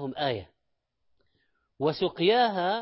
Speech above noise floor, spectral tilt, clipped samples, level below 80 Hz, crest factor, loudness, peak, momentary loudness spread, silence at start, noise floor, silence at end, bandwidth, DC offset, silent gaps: 51 dB; -9.5 dB/octave; under 0.1%; -64 dBFS; 16 dB; -26 LUFS; -12 dBFS; 8 LU; 0 s; -77 dBFS; 0 s; 5.8 kHz; under 0.1%; none